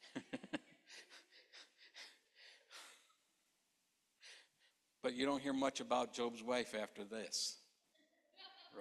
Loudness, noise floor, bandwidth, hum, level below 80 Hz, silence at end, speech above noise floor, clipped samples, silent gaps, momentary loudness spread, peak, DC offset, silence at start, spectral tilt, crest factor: -42 LUFS; -83 dBFS; 13 kHz; none; -84 dBFS; 0 s; 41 dB; under 0.1%; none; 22 LU; -24 dBFS; under 0.1%; 0 s; -2.5 dB/octave; 22 dB